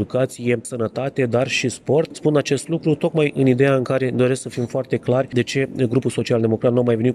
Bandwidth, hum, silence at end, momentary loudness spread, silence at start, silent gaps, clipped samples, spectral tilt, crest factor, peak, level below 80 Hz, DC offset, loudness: 12.5 kHz; none; 0 s; 6 LU; 0 s; none; under 0.1%; -6 dB/octave; 14 dB; -4 dBFS; -60 dBFS; under 0.1%; -20 LUFS